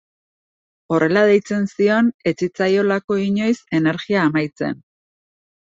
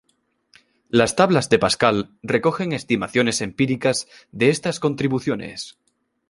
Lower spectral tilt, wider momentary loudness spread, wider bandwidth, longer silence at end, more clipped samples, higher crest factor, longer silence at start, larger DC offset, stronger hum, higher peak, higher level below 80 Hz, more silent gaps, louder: first, -6.5 dB/octave vs -4.5 dB/octave; about the same, 8 LU vs 10 LU; second, 7.8 kHz vs 11.5 kHz; first, 1 s vs 0.6 s; neither; about the same, 16 dB vs 20 dB; about the same, 0.9 s vs 0.95 s; neither; neither; about the same, -2 dBFS vs -2 dBFS; second, -62 dBFS vs -54 dBFS; first, 2.14-2.19 s, 3.04-3.08 s vs none; about the same, -18 LUFS vs -20 LUFS